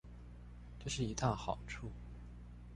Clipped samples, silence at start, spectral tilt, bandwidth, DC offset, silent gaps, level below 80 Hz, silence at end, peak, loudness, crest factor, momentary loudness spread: under 0.1%; 0.05 s; -5 dB/octave; 11.5 kHz; under 0.1%; none; -52 dBFS; 0 s; -20 dBFS; -41 LUFS; 22 dB; 18 LU